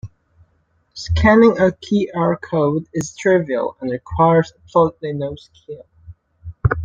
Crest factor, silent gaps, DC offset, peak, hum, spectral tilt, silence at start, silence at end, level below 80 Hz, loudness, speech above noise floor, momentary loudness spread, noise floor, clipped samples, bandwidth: 16 dB; none; under 0.1%; -2 dBFS; none; -7 dB/octave; 0.05 s; 0 s; -36 dBFS; -17 LUFS; 45 dB; 23 LU; -62 dBFS; under 0.1%; 8.6 kHz